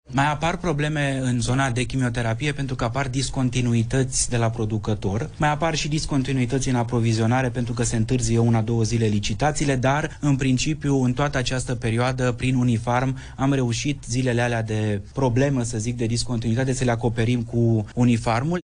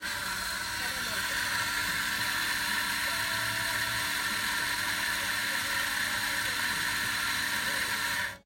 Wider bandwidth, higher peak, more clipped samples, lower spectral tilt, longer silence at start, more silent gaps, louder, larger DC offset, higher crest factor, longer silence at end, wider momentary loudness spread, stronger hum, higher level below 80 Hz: second, 10.5 kHz vs 16.5 kHz; first, -8 dBFS vs -18 dBFS; neither; first, -5.5 dB/octave vs -0.5 dB/octave; about the same, 0.1 s vs 0 s; neither; first, -23 LUFS vs -29 LUFS; neither; about the same, 14 dB vs 12 dB; about the same, 0 s vs 0.05 s; about the same, 4 LU vs 2 LU; neither; first, -38 dBFS vs -56 dBFS